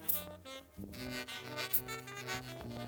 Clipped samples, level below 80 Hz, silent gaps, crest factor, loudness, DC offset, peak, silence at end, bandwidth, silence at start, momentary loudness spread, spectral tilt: under 0.1%; -62 dBFS; none; 26 dB; -39 LUFS; under 0.1%; -16 dBFS; 0 s; over 20 kHz; 0 s; 15 LU; -3 dB/octave